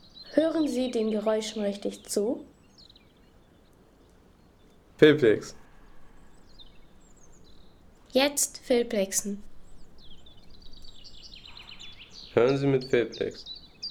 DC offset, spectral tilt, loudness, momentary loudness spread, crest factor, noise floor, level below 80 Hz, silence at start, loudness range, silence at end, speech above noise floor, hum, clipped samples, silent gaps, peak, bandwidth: under 0.1%; -4 dB/octave; -26 LUFS; 22 LU; 24 dB; -58 dBFS; -56 dBFS; 0.15 s; 8 LU; 0 s; 32 dB; none; under 0.1%; none; -6 dBFS; 18.5 kHz